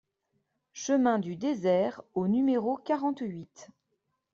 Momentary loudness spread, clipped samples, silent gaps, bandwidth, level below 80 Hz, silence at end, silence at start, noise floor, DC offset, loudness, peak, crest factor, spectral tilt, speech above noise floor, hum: 13 LU; under 0.1%; none; 7.6 kHz; -72 dBFS; 0.7 s; 0.75 s; -79 dBFS; under 0.1%; -29 LUFS; -14 dBFS; 16 dB; -6.5 dB/octave; 51 dB; none